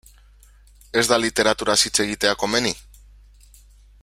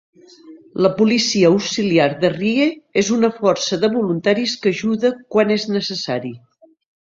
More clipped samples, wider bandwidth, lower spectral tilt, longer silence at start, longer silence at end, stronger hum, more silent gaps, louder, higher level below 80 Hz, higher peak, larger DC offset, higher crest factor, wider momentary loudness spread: neither; first, 16.5 kHz vs 7.8 kHz; second, -2 dB/octave vs -4.5 dB/octave; first, 0.95 s vs 0.45 s; first, 1.25 s vs 0.65 s; first, 50 Hz at -45 dBFS vs none; neither; about the same, -19 LUFS vs -17 LUFS; first, -48 dBFS vs -58 dBFS; about the same, -2 dBFS vs -2 dBFS; neither; first, 22 dB vs 16 dB; about the same, 7 LU vs 7 LU